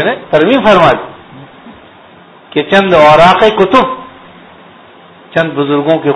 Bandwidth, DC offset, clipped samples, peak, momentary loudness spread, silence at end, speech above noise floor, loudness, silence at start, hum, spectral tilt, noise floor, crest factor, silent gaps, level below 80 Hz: 11 kHz; under 0.1%; 1%; 0 dBFS; 12 LU; 0 s; 30 dB; -8 LUFS; 0 s; none; -6 dB/octave; -38 dBFS; 10 dB; none; -40 dBFS